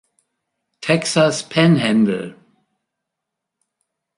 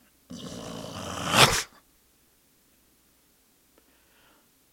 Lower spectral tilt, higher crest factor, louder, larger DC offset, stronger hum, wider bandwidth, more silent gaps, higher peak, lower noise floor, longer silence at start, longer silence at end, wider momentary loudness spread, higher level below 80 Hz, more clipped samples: first, -5.5 dB/octave vs -2.5 dB/octave; second, 18 dB vs 32 dB; first, -17 LUFS vs -24 LUFS; neither; neither; second, 11.5 kHz vs 17 kHz; neither; second, -4 dBFS vs 0 dBFS; first, -81 dBFS vs -64 dBFS; first, 0.8 s vs 0.3 s; second, 1.85 s vs 3.05 s; second, 13 LU vs 22 LU; second, -62 dBFS vs -52 dBFS; neither